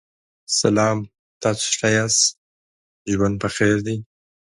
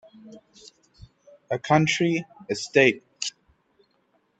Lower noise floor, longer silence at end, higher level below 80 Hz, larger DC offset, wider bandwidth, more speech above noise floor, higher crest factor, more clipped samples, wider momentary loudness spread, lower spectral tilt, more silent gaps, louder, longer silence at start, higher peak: first, under -90 dBFS vs -68 dBFS; second, 0.55 s vs 1.1 s; first, -50 dBFS vs -64 dBFS; neither; first, 11.5 kHz vs 8.8 kHz; first, over 71 dB vs 46 dB; about the same, 20 dB vs 24 dB; neither; about the same, 11 LU vs 13 LU; about the same, -3.5 dB/octave vs -4.5 dB/octave; first, 1.19-1.41 s, 2.37-3.05 s vs none; first, -20 LUFS vs -23 LUFS; first, 0.5 s vs 0.25 s; about the same, -2 dBFS vs -4 dBFS